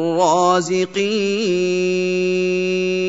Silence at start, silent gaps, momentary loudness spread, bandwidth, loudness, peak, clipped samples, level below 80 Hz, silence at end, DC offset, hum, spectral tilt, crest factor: 0 s; none; 4 LU; 8 kHz; -18 LUFS; -2 dBFS; under 0.1%; -66 dBFS; 0 s; 0.3%; none; -5 dB/octave; 16 dB